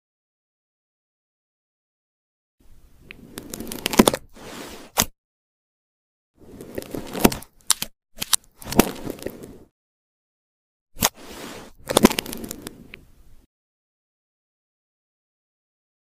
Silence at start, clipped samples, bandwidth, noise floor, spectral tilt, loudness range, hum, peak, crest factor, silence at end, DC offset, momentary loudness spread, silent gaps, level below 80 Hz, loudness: 3.15 s; under 0.1%; 16 kHz; -48 dBFS; -3 dB/octave; 6 LU; none; 0 dBFS; 28 dB; 3.15 s; under 0.1%; 22 LU; 5.18-6.34 s, 9.71-10.86 s; -46 dBFS; -23 LUFS